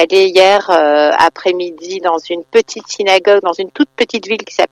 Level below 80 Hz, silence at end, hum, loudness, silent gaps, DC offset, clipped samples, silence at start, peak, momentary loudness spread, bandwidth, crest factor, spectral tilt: -58 dBFS; 0.05 s; none; -12 LUFS; none; under 0.1%; under 0.1%; 0 s; 0 dBFS; 10 LU; 12 kHz; 12 dB; -2.5 dB/octave